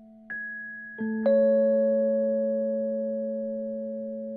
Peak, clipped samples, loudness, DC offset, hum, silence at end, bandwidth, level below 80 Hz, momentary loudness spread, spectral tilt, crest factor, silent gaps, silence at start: -12 dBFS; under 0.1%; -27 LUFS; under 0.1%; none; 0 s; 4.2 kHz; -76 dBFS; 14 LU; -11 dB/octave; 14 dB; none; 0 s